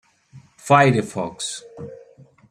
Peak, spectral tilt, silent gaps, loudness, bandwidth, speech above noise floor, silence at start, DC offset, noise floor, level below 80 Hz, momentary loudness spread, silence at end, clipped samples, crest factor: -2 dBFS; -5 dB/octave; none; -19 LUFS; 13 kHz; 30 dB; 0.35 s; under 0.1%; -49 dBFS; -58 dBFS; 24 LU; 0.55 s; under 0.1%; 20 dB